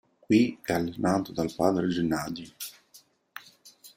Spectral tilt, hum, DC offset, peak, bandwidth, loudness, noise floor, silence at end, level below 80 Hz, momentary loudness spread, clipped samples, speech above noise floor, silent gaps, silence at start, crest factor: -6 dB/octave; none; under 0.1%; -8 dBFS; 16 kHz; -27 LUFS; -59 dBFS; 0.05 s; -60 dBFS; 22 LU; under 0.1%; 32 dB; none; 0.3 s; 20 dB